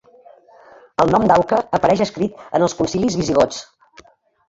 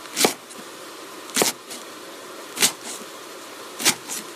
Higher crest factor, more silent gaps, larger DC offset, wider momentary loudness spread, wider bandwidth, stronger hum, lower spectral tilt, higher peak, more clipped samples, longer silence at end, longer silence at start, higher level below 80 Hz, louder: second, 18 dB vs 26 dB; neither; neither; second, 7 LU vs 17 LU; second, 8 kHz vs 15.5 kHz; neither; first, -5.5 dB/octave vs -0.5 dB/octave; about the same, -2 dBFS vs -2 dBFS; neither; first, 0.85 s vs 0 s; first, 1 s vs 0 s; first, -46 dBFS vs -80 dBFS; first, -18 LUFS vs -23 LUFS